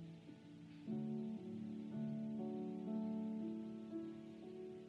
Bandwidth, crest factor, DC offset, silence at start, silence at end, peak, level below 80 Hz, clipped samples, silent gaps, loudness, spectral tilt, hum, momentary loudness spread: 6.8 kHz; 12 dB; under 0.1%; 0 s; 0 s; -34 dBFS; -84 dBFS; under 0.1%; none; -47 LUFS; -9 dB/octave; none; 11 LU